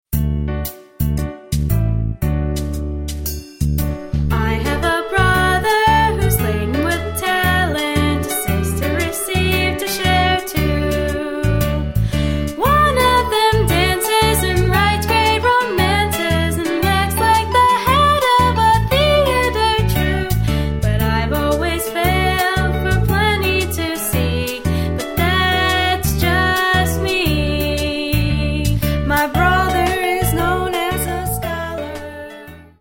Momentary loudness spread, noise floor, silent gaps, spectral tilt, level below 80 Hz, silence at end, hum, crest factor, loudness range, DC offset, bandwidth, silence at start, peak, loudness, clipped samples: 8 LU; -37 dBFS; none; -5 dB/octave; -26 dBFS; 0.2 s; none; 14 dB; 4 LU; under 0.1%; 17 kHz; 0.1 s; -2 dBFS; -17 LUFS; under 0.1%